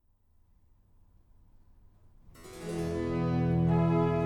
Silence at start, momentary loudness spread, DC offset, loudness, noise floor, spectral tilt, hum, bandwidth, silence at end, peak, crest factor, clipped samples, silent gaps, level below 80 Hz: 2.25 s; 15 LU; under 0.1%; -29 LUFS; -65 dBFS; -8.5 dB/octave; none; 11.5 kHz; 0 s; -18 dBFS; 14 dB; under 0.1%; none; -50 dBFS